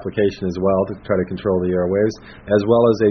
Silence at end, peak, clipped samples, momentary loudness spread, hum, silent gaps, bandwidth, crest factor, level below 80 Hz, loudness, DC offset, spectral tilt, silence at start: 0 s; -2 dBFS; under 0.1%; 7 LU; none; none; 6.6 kHz; 16 dB; -46 dBFS; -19 LUFS; under 0.1%; -7 dB/octave; 0 s